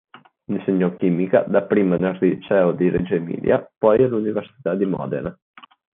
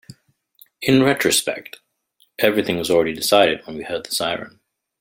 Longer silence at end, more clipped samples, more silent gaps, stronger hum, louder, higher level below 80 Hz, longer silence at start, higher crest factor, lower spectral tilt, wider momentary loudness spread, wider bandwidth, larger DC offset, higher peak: about the same, 0.6 s vs 0.5 s; neither; neither; neither; about the same, -20 LUFS vs -19 LUFS; about the same, -54 dBFS vs -58 dBFS; first, 0.5 s vs 0.1 s; about the same, 16 dB vs 20 dB; first, -7.5 dB/octave vs -3.5 dB/octave; second, 8 LU vs 15 LU; second, 3.8 kHz vs 17 kHz; neither; about the same, -4 dBFS vs -2 dBFS